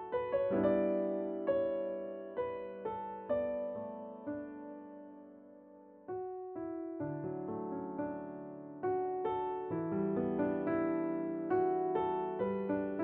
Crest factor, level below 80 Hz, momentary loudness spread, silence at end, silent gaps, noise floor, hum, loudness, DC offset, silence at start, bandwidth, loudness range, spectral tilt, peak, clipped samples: 16 dB; -68 dBFS; 15 LU; 0 s; none; -57 dBFS; none; -37 LUFS; under 0.1%; 0 s; 3.9 kHz; 9 LU; -7.5 dB/octave; -20 dBFS; under 0.1%